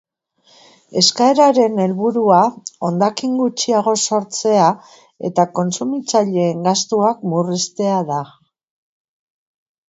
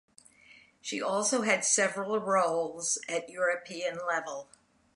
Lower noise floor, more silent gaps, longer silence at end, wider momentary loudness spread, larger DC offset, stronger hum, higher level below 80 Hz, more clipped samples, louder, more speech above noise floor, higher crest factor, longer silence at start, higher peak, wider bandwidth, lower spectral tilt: about the same, -56 dBFS vs -59 dBFS; neither; first, 1.6 s vs 0.5 s; about the same, 9 LU vs 10 LU; neither; neither; first, -66 dBFS vs -80 dBFS; neither; first, -16 LUFS vs -29 LUFS; first, 40 dB vs 28 dB; about the same, 18 dB vs 20 dB; first, 0.9 s vs 0.5 s; first, 0 dBFS vs -12 dBFS; second, 8 kHz vs 11.5 kHz; first, -4.5 dB/octave vs -2 dB/octave